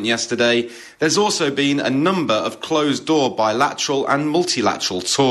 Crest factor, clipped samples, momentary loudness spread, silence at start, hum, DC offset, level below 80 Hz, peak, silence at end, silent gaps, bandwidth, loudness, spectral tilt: 16 dB; under 0.1%; 4 LU; 0 s; none; under 0.1%; -62 dBFS; -2 dBFS; 0 s; none; 13 kHz; -18 LUFS; -3.5 dB/octave